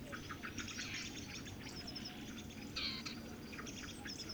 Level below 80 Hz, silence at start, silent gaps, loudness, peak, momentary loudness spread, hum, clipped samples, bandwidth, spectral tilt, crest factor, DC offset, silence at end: -62 dBFS; 0 s; none; -46 LUFS; -30 dBFS; 7 LU; none; under 0.1%; over 20 kHz; -3 dB/octave; 18 dB; under 0.1%; 0 s